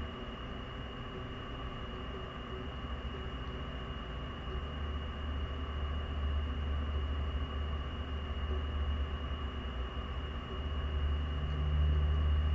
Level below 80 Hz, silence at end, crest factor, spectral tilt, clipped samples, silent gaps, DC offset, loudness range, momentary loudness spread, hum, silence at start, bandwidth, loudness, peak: -38 dBFS; 0 s; 14 dB; -7.5 dB/octave; under 0.1%; none; under 0.1%; 6 LU; 10 LU; none; 0 s; 4.8 kHz; -38 LUFS; -22 dBFS